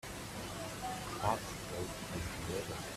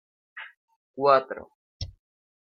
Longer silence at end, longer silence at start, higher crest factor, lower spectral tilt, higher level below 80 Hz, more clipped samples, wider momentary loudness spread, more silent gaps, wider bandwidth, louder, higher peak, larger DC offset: second, 0 s vs 0.6 s; second, 0.05 s vs 0.35 s; about the same, 22 dB vs 24 dB; second, -4 dB/octave vs -5.5 dB/octave; about the same, -54 dBFS vs -54 dBFS; neither; second, 7 LU vs 24 LU; second, none vs 0.57-0.68 s, 0.76-0.94 s, 1.55-1.80 s; first, 16 kHz vs 6.8 kHz; second, -40 LUFS vs -23 LUFS; second, -20 dBFS vs -6 dBFS; neither